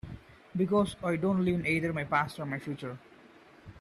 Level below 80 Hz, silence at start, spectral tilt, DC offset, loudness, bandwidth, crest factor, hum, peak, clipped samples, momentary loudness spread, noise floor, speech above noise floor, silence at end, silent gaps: -58 dBFS; 0.05 s; -7 dB/octave; under 0.1%; -31 LUFS; 13.5 kHz; 18 dB; none; -14 dBFS; under 0.1%; 15 LU; -56 dBFS; 26 dB; 0.1 s; none